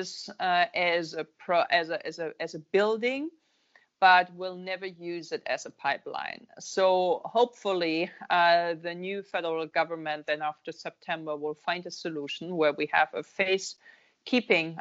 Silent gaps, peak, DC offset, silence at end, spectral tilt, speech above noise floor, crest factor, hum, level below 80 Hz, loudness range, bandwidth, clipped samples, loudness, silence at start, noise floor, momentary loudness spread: none; -8 dBFS; under 0.1%; 0 s; -1.5 dB/octave; 36 dB; 20 dB; none; -78 dBFS; 5 LU; 8 kHz; under 0.1%; -28 LUFS; 0 s; -65 dBFS; 13 LU